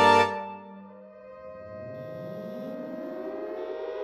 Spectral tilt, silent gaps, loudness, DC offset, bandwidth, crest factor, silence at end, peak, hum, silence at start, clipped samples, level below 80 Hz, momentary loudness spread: -4.5 dB/octave; none; -31 LUFS; under 0.1%; 14 kHz; 22 dB; 0 s; -8 dBFS; none; 0 s; under 0.1%; -70 dBFS; 20 LU